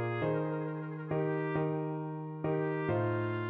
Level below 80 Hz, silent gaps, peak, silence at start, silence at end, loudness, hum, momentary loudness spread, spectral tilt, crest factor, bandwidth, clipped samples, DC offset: -68 dBFS; none; -20 dBFS; 0 s; 0 s; -34 LUFS; none; 6 LU; -7.5 dB/octave; 14 dB; 4.4 kHz; under 0.1%; under 0.1%